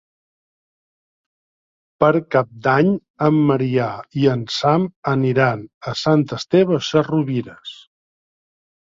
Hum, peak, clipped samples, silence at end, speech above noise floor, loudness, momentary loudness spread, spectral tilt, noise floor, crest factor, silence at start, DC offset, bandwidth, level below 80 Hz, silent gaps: none; -2 dBFS; under 0.1%; 1.25 s; over 72 dB; -18 LUFS; 9 LU; -7 dB/octave; under -90 dBFS; 18 dB; 2 s; under 0.1%; 7.6 kHz; -58 dBFS; 3.10-3.14 s, 4.96-5.02 s, 5.74-5.81 s